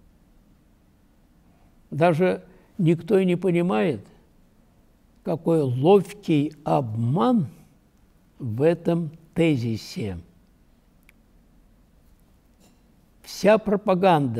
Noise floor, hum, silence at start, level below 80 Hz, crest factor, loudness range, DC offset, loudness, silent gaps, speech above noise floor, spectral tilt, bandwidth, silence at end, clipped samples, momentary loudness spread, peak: -58 dBFS; none; 1.9 s; -58 dBFS; 18 dB; 7 LU; under 0.1%; -23 LUFS; none; 37 dB; -7.5 dB/octave; 14.5 kHz; 0 s; under 0.1%; 14 LU; -6 dBFS